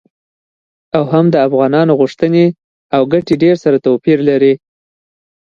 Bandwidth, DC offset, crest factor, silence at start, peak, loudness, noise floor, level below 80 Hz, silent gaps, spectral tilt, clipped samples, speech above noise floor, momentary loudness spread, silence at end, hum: 7.2 kHz; under 0.1%; 12 dB; 0.95 s; 0 dBFS; -12 LUFS; under -90 dBFS; -54 dBFS; 2.64-2.90 s; -8.5 dB/octave; under 0.1%; over 79 dB; 5 LU; 1.05 s; none